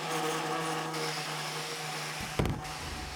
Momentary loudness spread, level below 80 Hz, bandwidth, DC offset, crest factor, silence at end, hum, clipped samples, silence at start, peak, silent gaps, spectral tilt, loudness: 4 LU; -48 dBFS; over 20 kHz; under 0.1%; 20 dB; 0 s; none; under 0.1%; 0 s; -16 dBFS; none; -3.5 dB/octave; -34 LUFS